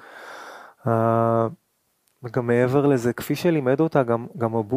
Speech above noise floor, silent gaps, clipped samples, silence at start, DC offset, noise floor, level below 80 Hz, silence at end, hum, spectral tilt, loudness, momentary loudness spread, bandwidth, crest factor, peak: 48 dB; none; under 0.1%; 0.1 s; under 0.1%; -69 dBFS; -62 dBFS; 0 s; none; -7.5 dB/octave; -22 LUFS; 19 LU; 15.5 kHz; 18 dB; -4 dBFS